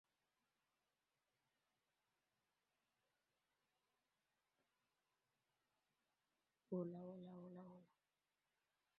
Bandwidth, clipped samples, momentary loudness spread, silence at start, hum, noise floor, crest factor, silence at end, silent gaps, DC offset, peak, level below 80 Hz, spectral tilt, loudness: 4.2 kHz; under 0.1%; 14 LU; 6.7 s; 50 Hz at -110 dBFS; under -90 dBFS; 26 dB; 1.15 s; none; under 0.1%; -36 dBFS; under -90 dBFS; -9.5 dB/octave; -54 LUFS